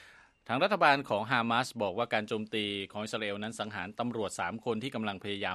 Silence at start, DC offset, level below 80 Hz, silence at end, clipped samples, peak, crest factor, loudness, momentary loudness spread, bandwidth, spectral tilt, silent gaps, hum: 0 s; under 0.1%; -72 dBFS; 0 s; under 0.1%; -8 dBFS; 24 dB; -32 LUFS; 11 LU; 13 kHz; -4.5 dB/octave; none; none